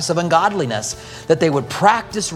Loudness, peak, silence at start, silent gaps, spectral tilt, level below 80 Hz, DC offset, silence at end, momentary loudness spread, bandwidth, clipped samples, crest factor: -17 LUFS; 0 dBFS; 0 s; none; -4 dB/octave; -50 dBFS; under 0.1%; 0 s; 8 LU; 15.5 kHz; under 0.1%; 18 dB